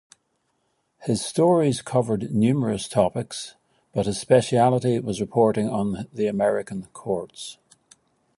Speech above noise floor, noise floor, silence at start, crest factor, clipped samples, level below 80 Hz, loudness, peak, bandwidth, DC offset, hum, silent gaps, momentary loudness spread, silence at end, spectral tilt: 49 dB; -72 dBFS; 1 s; 20 dB; under 0.1%; -56 dBFS; -23 LUFS; -4 dBFS; 11.5 kHz; under 0.1%; none; none; 15 LU; 0.85 s; -6 dB/octave